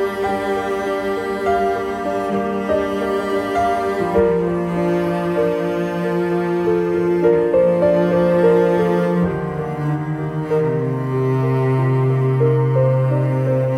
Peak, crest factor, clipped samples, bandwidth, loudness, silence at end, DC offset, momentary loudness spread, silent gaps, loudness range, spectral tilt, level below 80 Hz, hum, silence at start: -4 dBFS; 14 dB; under 0.1%; 13 kHz; -18 LUFS; 0 s; under 0.1%; 6 LU; none; 4 LU; -8.5 dB/octave; -46 dBFS; none; 0 s